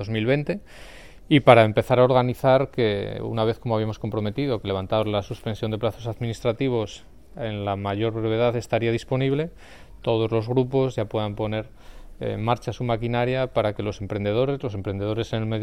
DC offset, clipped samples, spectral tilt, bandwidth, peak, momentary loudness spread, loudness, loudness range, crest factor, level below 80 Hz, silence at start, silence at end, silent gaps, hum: 0.4%; under 0.1%; -7.5 dB/octave; 13.5 kHz; 0 dBFS; 11 LU; -24 LUFS; 6 LU; 24 dB; -46 dBFS; 0 s; 0 s; none; none